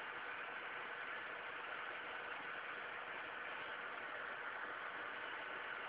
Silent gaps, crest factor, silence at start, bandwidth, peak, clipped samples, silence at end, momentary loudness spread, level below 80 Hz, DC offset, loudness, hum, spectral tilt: none; 14 dB; 0 s; 4 kHz; -34 dBFS; under 0.1%; 0 s; 1 LU; -84 dBFS; under 0.1%; -46 LUFS; none; 1 dB/octave